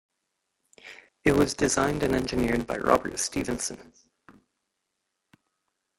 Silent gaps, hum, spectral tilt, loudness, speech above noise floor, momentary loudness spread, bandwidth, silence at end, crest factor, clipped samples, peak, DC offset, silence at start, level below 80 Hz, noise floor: none; none; -4 dB/octave; -26 LUFS; 55 dB; 21 LU; 16.5 kHz; 2.15 s; 24 dB; under 0.1%; -6 dBFS; under 0.1%; 0.85 s; -48 dBFS; -81 dBFS